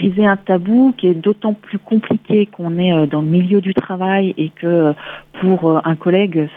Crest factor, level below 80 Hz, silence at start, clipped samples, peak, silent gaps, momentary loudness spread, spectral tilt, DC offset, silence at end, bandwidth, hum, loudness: 14 dB; -58 dBFS; 0 s; under 0.1%; -2 dBFS; none; 6 LU; -10.5 dB/octave; under 0.1%; 0 s; 3.9 kHz; none; -15 LUFS